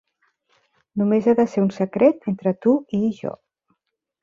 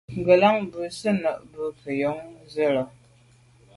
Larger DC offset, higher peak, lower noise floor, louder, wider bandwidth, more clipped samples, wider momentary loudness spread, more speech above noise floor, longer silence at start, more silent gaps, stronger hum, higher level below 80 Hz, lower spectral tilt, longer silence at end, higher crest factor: neither; about the same, -4 dBFS vs -4 dBFS; first, -76 dBFS vs -56 dBFS; first, -20 LUFS vs -24 LUFS; second, 7.4 kHz vs 11.5 kHz; neither; second, 10 LU vs 16 LU; first, 56 dB vs 32 dB; first, 0.95 s vs 0.1 s; neither; neither; about the same, -62 dBFS vs -60 dBFS; first, -9 dB/octave vs -6 dB/octave; about the same, 0.9 s vs 0.9 s; about the same, 18 dB vs 20 dB